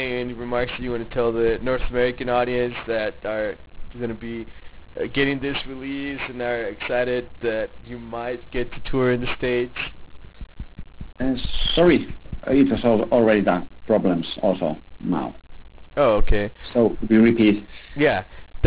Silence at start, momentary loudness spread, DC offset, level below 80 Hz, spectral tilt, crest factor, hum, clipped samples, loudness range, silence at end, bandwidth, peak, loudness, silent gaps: 0 s; 16 LU; 0.3%; -36 dBFS; -10 dB/octave; 16 dB; none; under 0.1%; 7 LU; 0 s; 4 kHz; -6 dBFS; -22 LUFS; none